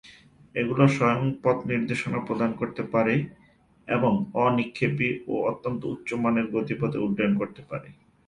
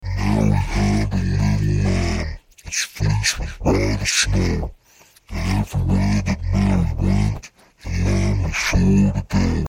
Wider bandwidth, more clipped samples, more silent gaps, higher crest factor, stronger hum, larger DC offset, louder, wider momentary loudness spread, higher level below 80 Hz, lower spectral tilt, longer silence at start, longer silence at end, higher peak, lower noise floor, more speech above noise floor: second, 10.5 kHz vs 16 kHz; neither; neither; about the same, 20 dB vs 16 dB; neither; neither; second, -26 LUFS vs -20 LUFS; about the same, 9 LU vs 9 LU; second, -60 dBFS vs -26 dBFS; first, -7.5 dB/octave vs -5 dB/octave; about the same, 0.05 s vs 0 s; first, 0.35 s vs 0 s; about the same, -6 dBFS vs -4 dBFS; about the same, -52 dBFS vs -52 dBFS; second, 27 dB vs 34 dB